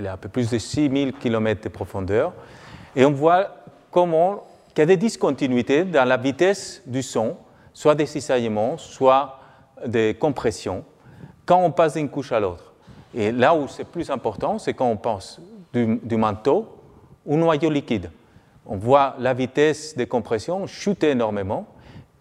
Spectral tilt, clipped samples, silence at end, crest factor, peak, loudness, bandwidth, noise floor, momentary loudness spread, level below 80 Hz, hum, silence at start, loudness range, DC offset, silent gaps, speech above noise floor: -6 dB/octave; under 0.1%; 0.2 s; 20 dB; -2 dBFS; -22 LUFS; 12.5 kHz; -51 dBFS; 12 LU; -56 dBFS; none; 0 s; 3 LU; under 0.1%; none; 30 dB